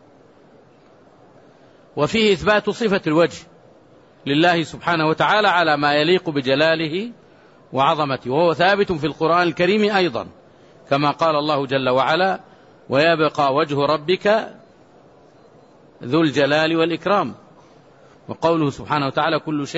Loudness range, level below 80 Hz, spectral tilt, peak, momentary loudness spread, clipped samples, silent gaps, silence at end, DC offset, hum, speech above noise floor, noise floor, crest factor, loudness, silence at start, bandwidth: 3 LU; -56 dBFS; -5.5 dB/octave; -4 dBFS; 7 LU; under 0.1%; none; 0 s; under 0.1%; none; 32 dB; -50 dBFS; 16 dB; -18 LUFS; 1.95 s; 8 kHz